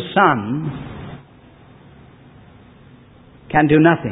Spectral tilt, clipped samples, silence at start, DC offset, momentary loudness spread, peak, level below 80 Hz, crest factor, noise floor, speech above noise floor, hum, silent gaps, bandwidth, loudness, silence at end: -12 dB/octave; under 0.1%; 0 s; under 0.1%; 23 LU; 0 dBFS; -48 dBFS; 20 dB; -46 dBFS; 31 dB; none; none; 4 kHz; -16 LUFS; 0 s